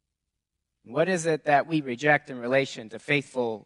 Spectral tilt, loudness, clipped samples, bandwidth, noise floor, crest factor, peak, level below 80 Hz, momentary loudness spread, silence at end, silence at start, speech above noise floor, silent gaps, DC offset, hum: -5 dB/octave; -26 LUFS; under 0.1%; 11.5 kHz; -84 dBFS; 20 dB; -6 dBFS; -72 dBFS; 8 LU; 0.05 s; 0.9 s; 58 dB; none; under 0.1%; none